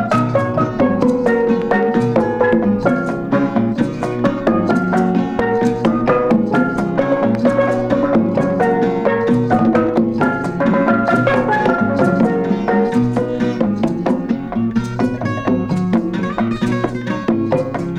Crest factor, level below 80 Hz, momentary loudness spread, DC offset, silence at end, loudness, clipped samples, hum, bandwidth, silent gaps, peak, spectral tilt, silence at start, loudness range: 16 dB; -42 dBFS; 5 LU; under 0.1%; 0 s; -16 LUFS; under 0.1%; none; 9.6 kHz; none; 0 dBFS; -8 dB/octave; 0 s; 3 LU